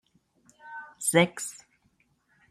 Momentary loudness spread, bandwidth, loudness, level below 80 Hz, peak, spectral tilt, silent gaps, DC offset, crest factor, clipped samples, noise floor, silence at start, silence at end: 21 LU; 15 kHz; -26 LUFS; -72 dBFS; -8 dBFS; -3.5 dB/octave; none; under 0.1%; 24 dB; under 0.1%; -69 dBFS; 0.65 s; 0.95 s